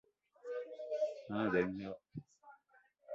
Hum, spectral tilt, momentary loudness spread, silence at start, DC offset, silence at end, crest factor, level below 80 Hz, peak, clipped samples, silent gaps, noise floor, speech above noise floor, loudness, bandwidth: none; -5.5 dB/octave; 18 LU; 0.45 s; under 0.1%; 0 s; 20 dB; -72 dBFS; -22 dBFS; under 0.1%; none; -71 dBFS; 33 dB; -40 LUFS; 7.6 kHz